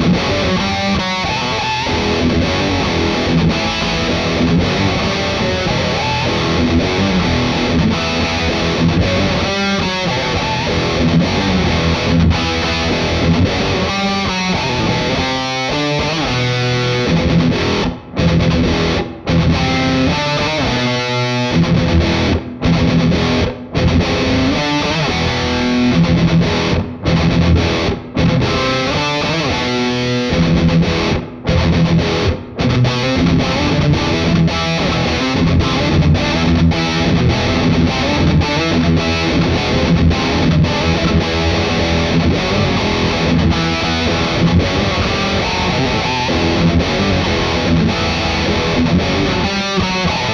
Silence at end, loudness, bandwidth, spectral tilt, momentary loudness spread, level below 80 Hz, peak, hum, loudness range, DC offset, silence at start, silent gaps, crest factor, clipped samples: 0 s; -15 LUFS; 7.4 kHz; -5.5 dB/octave; 3 LU; -28 dBFS; -2 dBFS; none; 1 LU; under 0.1%; 0 s; none; 14 dB; under 0.1%